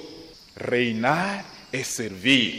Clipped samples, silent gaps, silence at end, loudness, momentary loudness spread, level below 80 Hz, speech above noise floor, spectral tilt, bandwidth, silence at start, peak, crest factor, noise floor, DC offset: under 0.1%; none; 0 s; -24 LUFS; 21 LU; -60 dBFS; 21 dB; -3.5 dB/octave; 15.5 kHz; 0 s; -6 dBFS; 20 dB; -45 dBFS; under 0.1%